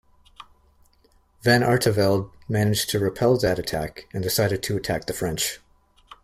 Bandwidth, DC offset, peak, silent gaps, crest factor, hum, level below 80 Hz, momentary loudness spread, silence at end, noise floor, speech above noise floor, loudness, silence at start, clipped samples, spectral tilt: 16 kHz; under 0.1%; -4 dBFS; none; 20 dB; none; -50 dBFS; 9 LU; 0.1 s; -60 dBFS; 38 dB; -23 LUFS; 0.4 s; under 0.1%; -4.5 dB/octave